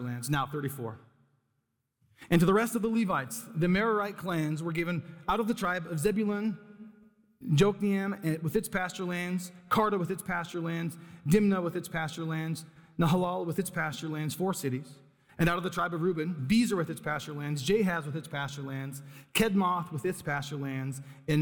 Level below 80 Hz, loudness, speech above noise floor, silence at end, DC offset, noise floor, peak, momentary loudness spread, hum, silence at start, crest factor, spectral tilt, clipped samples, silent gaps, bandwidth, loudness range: -56 dBFS; -31 LUFS; 49 dB; 0 s; under 0.1%; -79 dBFS; -12 dBFS; 11 LU; none; 0 s; 18 dB; -6 dB/octave; under 0.1%; none; 19.5 kHz; 3 LU